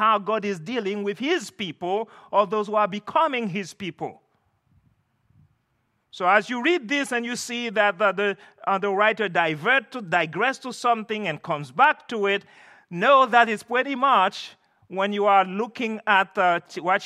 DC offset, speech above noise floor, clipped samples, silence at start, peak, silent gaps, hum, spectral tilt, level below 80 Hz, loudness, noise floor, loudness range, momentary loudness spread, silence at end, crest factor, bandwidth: under 0.1%; 48 dB; under 0.1%; 0 s; -4 dBFS; none; none; -4 dB/octave; -78 dBFS; -23 LUFS; -71 dBFS; 6 LU; 10 LU; 0 s; 20 dB; 14 kHz